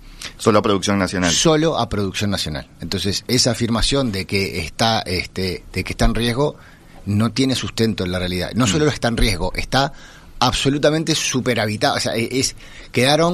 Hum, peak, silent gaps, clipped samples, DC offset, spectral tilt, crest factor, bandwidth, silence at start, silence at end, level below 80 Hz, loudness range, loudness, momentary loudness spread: none; 0 dBFS; none; under 0.1%; under 0.1%; -4 dB/octave; 18 dB; 14 kHz; 0 s; 0 s; -32 dBFS; 3 LU; -19 LUFS; 7 LU